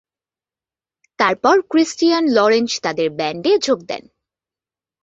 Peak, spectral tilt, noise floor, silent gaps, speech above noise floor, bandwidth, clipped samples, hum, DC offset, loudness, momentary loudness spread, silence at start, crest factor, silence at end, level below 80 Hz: -2 dBFS; -3.5 dB/octave; under -90 dBFS; none; over 74 dB; 8 kHz; under 0.1%; none; under 0.1%; -17 LUFS; 6 LU; 1.2 s; 18 dB; 1.05 s; -64 dBFS